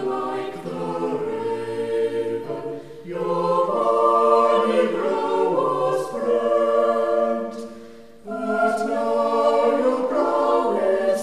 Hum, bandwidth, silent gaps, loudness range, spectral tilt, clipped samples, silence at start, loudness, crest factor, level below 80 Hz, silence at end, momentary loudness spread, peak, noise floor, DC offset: none; 13 kHz; none; 5 LU; -6 dB/octave; under 0.1%; 0 s; -21 LUFS; 16 dB; -62 dBFS; 0 s; 12 LU; -6 dBFS; -43 dBFS; 0.4%